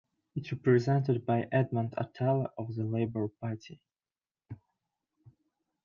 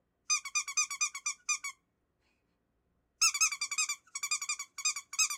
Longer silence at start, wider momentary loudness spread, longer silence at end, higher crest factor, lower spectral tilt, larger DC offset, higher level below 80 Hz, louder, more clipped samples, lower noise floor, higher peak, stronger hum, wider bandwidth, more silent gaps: about the same, 0.35 s vs 0.3 s; first, 23 LU vs 7 LU; first, 1.3 s vs 0 s; about the same, 18 dB vs 18 dB; first, -9 dB/octave vs 6 dB/octave; neither; first, -72 dBFS vs -78 dBFS; about the same, -31 LUFS vs -31 LUFS; neither; first, under -90 dBFS vs -78 dBFS; first, -14 dBFS vs -18 dBFS; neither; second, 7 kHz vs 16.5 kHz; neither